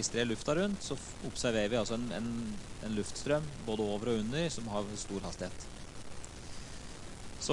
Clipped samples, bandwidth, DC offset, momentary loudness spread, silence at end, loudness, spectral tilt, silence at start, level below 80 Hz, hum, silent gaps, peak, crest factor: under 0.1%; 11.5 kHz; under 0.1%; 15 LU; 0 s; -36 LUFS; -4.5 dB/octave; 0 s; -52 dBFS; none; none; -18 dBFS; 18 dB